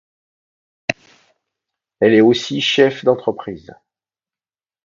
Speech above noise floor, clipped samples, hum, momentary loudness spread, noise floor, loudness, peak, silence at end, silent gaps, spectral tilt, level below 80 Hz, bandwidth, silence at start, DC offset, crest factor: over 75 dB; under 0.1%; none; 19 LU; under -90 dBFS; -16 LUFS; 0 dBFS; 1.3 s; none; -5 dB/octave; -58 dBFS; 7.6 kHz; 0.9 s; under 0.1%; 20 dB